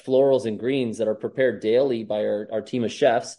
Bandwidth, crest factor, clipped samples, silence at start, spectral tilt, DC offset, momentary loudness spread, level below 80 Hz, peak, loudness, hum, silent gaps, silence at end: 11.5 kHz; 16 dB; under 0.1%; 0.05 s; -5.5 dB/octave; under 0.1%; 7 LU; -70 dBFS; -8 dBFS; -23 LUFS; none; none; 0.05 s